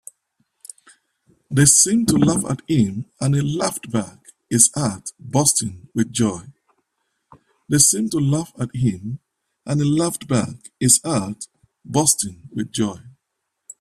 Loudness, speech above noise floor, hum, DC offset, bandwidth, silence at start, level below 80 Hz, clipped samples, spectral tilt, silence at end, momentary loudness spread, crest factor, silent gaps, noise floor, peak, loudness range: -18 LUFS; 58 dB; none; under 0.1%; 15.5 kHz; 1.5 s; -52 dBFS; under 0.1%; -4 dB/octave; 0.7 s; 17 LU; 22 dB; none; -77 dBFS; 0 dBFS; 3 LU